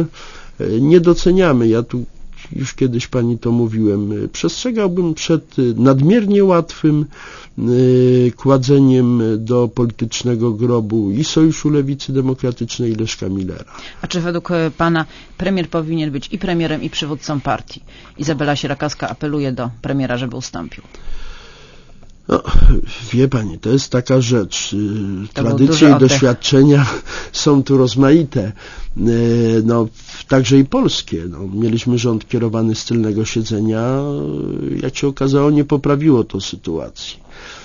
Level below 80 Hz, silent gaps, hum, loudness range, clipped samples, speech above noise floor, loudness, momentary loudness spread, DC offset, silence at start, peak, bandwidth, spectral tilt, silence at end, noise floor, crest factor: -28 dBFS; none; none; 8 LU; under 0.1%; 24 dB; -16 LUFS; 13 LU; under 0.1%; 0 s; 0 dBFS; 7.4 kHz; -6 dB/octave; 0 s; -39 dBFS; 16 dB